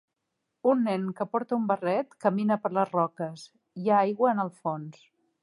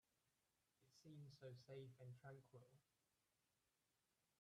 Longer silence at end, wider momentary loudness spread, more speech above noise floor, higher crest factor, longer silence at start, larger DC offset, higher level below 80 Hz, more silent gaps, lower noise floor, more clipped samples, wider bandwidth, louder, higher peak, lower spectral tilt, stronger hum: second, 0.5 s vs 1.6 s; first, 12 LU vs 5 LU; first, 55 dB vs 28 dB; about the same, 18 dB vs 18 dB; second, 0.65 s vs 0.8 s; neither; first, -82 dBFS vs under -90 dBFS; neither; second, -82 dBFS vs -90 dBFS; neither; about the same, 11.5 kHz vs 12 kHz; first, -28 LUFS vs -62 LUFS; first, -10 dBFS vs -48 dBFS; first, -8 dB/octave vs -6.5 dB/octave; neither